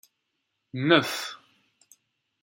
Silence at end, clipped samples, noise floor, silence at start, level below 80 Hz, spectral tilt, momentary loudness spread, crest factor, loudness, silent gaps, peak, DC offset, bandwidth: 1.05 s; under 0.1%; -79 dBFS; 0.75 s; -76 dBFS; -4.5 dB/octave; 19 LU; 26 dB; -24 LUFS; none; -4 dBFS; under 0.1%; 16.5 kHz